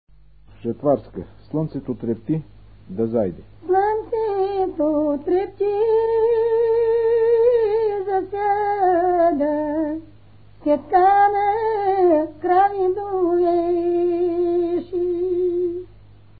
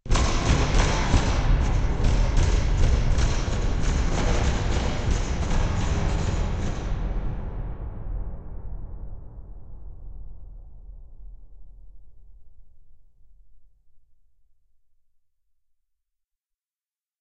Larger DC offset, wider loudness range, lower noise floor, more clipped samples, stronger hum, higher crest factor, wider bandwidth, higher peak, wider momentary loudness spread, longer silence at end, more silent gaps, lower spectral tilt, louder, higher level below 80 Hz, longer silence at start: first, 0.4% vs under 0.1%; second, 6 LU vs 22 LU; second, -50 dBFS vs under -90 dBFS; neither; first, 50 Hz at -55 dBFS vs none; second, 14 dB vs 20 dB; second, 4.8 kHz vs 8.6 kHz; about the same, -6 dBFS vs -4 dBFS; second, 10 LU vs 22 LU; second, 0.55 s vs 3.2 s; neither; first, -12 dB/octave vs -5.5 dB/octave; first, -20 LUFS vs -26 LUFS; second, -52 dBFS vs -26 dBFS; first, 0.65 s vs 0.05 s